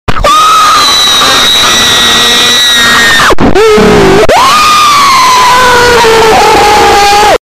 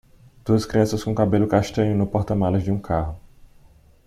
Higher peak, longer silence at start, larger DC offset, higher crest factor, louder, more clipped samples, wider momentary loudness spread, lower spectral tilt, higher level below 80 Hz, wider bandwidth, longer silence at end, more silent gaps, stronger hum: first, 0 dBFS vs -4 dBFS; second, 0.1 s vs 0.45 s; neither; second, 4 dB vs 18 dB; first, -2 LUFS vs -22 LUFS; first, 0.3% vs under 0.1%; second, 1 LU vs 6 LU; second, -2 dB/octave vs -7.5 dB/octave; first, -22 dBFS vs -42 dBFS; first, 16 kHz vs 14 kHz; second, 0.05 s vs 0.6 s; neither; neither